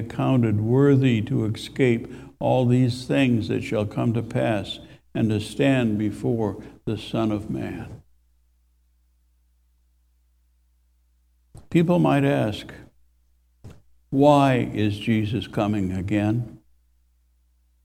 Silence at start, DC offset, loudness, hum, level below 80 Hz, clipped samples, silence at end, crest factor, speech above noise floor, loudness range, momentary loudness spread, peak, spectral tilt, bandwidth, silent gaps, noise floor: 0 s; under 0.1%; -23 LUFS; none; -52 dBFS; under 0.1%; 1.3 s; 20 dB; 41 dB; 10 LU; 13 LU; -4 dBFS; -7.5 dB/octave; 14 kHz; none; -63 dBFS